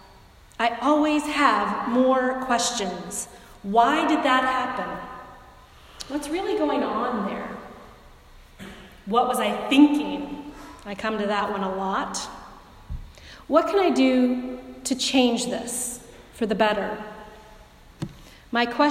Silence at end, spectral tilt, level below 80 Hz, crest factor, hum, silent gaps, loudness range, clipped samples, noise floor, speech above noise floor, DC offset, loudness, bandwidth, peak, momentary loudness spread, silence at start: 0 s; -3.5 dB/octave; -50 dBFS; 22 dB; none; none; 7 LU; under 0.1%; -50 dBFS; 28 dB; under 0.1%; -23 LUFS; 15.5 kHz; -4 dBFS; 21 LU; 0.6 s